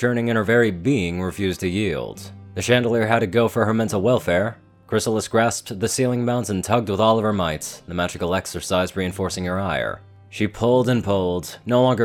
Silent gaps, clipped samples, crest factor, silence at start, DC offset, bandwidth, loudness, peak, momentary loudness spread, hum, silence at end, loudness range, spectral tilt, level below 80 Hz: none; under 0.1%; 20 dB; 0 s; under 0.1%; 18 kHz; -21 LUFS; 0 dBFS; 9 LU; none; 0 s; 2 LU; -5.5 dB/octave; -48 dBFS